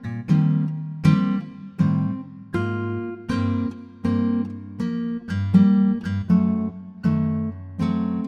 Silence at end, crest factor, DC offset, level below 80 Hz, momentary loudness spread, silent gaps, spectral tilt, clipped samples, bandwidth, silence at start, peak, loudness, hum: 0 s; 16 dB; under 0.1%; -52 dBFS; 11 LU; none; -9 dB/octave; under 0.1%; 7 kHz; 0 s; -6 dBFS; -23 LUFS; none